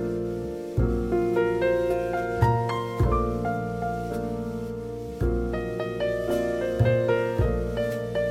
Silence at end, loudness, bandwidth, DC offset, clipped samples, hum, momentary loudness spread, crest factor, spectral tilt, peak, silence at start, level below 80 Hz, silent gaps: 0 s; -26 LUFS; 15.5 kHz; under 0.1%; under 0.1%; none; 8 LU; 18 dB; -8 dB/octave; -8 dBFS; 0 s; -36 dBFS; none